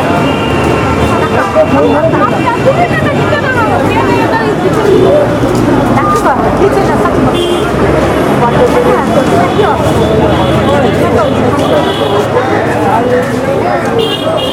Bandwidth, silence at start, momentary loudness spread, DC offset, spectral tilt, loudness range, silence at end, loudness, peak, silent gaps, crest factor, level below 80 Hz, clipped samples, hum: 17.5 kHz; 0 s; 3 LU; under 0.1%; -6.5 dB/octave; 1 LU; 0 s; -9 LUFS; 0 dBFS; none; 8 dB; -28 dBFS; 1%; none